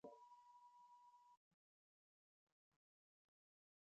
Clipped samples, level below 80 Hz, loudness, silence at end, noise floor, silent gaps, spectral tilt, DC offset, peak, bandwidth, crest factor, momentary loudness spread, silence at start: under 0.1%; under -90 dBFS; -67 LUFS; 1.2 s; under -90 dBFS; 1.37-2.72 s; -4.5 dB/octave; under 0.1%; -46 dBFS; 7.4 kHz; 24 dB; 4 LU; 0.05 s